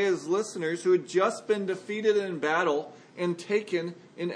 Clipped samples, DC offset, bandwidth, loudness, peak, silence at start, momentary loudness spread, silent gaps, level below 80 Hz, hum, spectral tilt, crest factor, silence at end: under 0.1%; under 0.1%; 10.5 kHz; -28 LUFS; -10 dBFS; 0 s; 7 LU; none; -84 dBFS; none; -5 dB/octave; 18 dB; 0 s